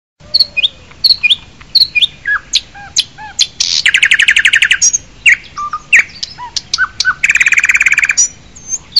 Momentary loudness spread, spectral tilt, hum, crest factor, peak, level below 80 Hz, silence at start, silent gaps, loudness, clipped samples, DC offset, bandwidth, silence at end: 12 LU; 2.5 dB/octave; none; 12 dB; 0 dBFS; -44 dBFS; 0.35 s; none; -9 LUFS; under 0.1%; 0.6%; 17 kHz; 0 s